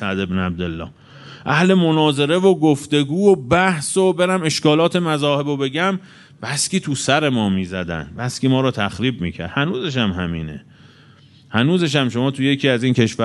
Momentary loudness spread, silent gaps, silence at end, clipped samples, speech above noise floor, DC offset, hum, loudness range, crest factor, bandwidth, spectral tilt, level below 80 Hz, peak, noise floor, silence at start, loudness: 11 LU; none; 0 s; under 0.1%; 30 dB; under 0.1%; none; 6 LU; 18 dB; 11.5 kHz; -5 dB/octave; -48 dBFS; 0 dBFS; -48 dBFS; 0 s; -18 LUFS